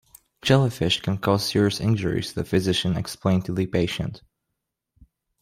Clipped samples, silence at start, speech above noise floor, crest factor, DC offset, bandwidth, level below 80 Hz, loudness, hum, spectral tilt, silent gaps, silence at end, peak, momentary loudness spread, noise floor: under 0.1%; 0.45 s; 59 dB; 20 dB; under 0.1%; 16 kHz; -50 dBFS; -23 LUFS; none; -5.5 dB/octave; none; 1.25 s; -6 dBFS; 7 LU; -81 dBFS